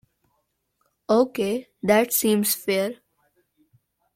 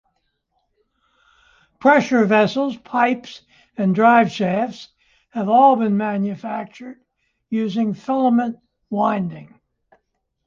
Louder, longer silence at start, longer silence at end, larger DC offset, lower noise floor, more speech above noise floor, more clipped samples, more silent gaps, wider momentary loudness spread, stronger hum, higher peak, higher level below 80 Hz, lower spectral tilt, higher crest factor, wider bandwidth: second, -22 LUFS vs -19 LUFS; second, 1.1 s vs 1.8 s; first, 1.2 s vs 1 s; neither; about the same, -73 dBFS vs -72 dBFS; about the same, 52 dB vs 54 dB; neither; neither; second, 8 LU vs 20 LU; neither; second, -6 dBFS vs -2 dBFS; about the same, -68 dBFS vs -64 dBFS; second, -4 dB/octave vs -7 dB/octave; about the same, 18 dB vs 18 dB; first, 16.5 kHz vs 7.4 kHz